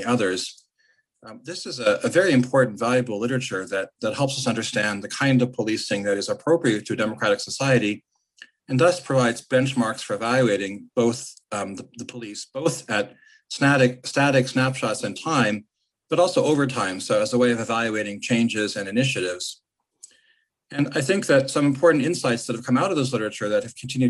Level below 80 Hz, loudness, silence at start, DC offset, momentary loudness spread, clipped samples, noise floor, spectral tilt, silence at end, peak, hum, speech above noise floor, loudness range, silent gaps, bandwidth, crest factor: -66 dBFS; -22 LUFS; 0 s; under 0.1%; 12 LU; under 0.1%; -66 dBFS; -5 dB/octave; 0 s; -6 dBFS; none; 44 dB; 3 LU; none; 12.5 kHz; 18 dB